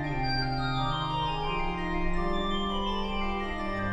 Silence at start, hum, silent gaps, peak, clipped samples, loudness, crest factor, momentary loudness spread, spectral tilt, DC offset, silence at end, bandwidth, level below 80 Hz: 0 s; none; none; -16 dBFS; under 0.1%; -31 LUFS; 14 dB; 3 LU; -6.5 dB/octave; under 0.1%; 0 s; 8.2 kHz; -36 dBFS